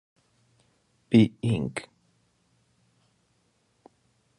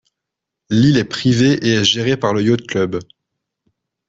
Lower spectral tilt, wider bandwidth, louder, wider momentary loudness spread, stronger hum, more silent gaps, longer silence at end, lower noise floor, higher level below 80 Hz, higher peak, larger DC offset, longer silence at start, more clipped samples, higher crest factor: first, -7.5 dB/octave vs -5.5 dB/octave; first, 11 kHz vs 8 kHz; second, -25 LUFS vs -15 LUFS; first, 14 LU vs 6 LU; neither; neither; first, 2.55 s vs 1.05 s; second, -70 dBFS vs -81 dBFS; second, -60 dBFS vs -50 dBFS; second, -8 dBFS vs -2 dBFS; neither; first, 1.1 s vs 0.7 s; neither; first, 24 dB vs 16 dB